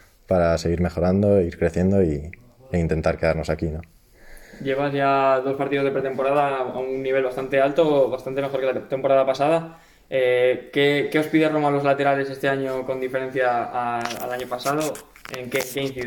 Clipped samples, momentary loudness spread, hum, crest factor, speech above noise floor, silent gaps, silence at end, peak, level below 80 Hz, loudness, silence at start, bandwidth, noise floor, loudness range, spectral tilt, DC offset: under 0.1%; 8 LU; none; 16 dB; 23 dB; none; 0 s; -6 dBFS; -46 dBFS; -22 LUFS; 0.3 s; 17.5 kHz; -45 dBFS; 4 LU; -6 dB/octave; under 0.1%